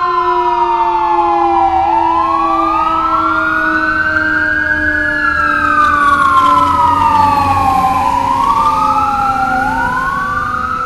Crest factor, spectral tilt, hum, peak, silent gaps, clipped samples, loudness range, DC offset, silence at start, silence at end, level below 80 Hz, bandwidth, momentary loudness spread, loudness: 12 dB; -5 dB/octave; none; 0 dBFS; none; under 0.1%; 2 LU; under 0.1%; 0 s; 0 s; -32 dBFS; 13.5 kHz; 4 LU; -11 LUFS